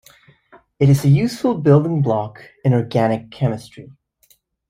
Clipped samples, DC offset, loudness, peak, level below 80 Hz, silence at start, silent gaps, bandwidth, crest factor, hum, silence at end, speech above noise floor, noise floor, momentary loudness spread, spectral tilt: under 0.1%; under 0.1%; -17 LUFS; -2 dBFS; -52 dBFS; 0.8 s; none; 14.5 kHz; 16 dB; none; 0.85 s; 42 dB; -58 dBFS; 9 LU; -8 dB/octave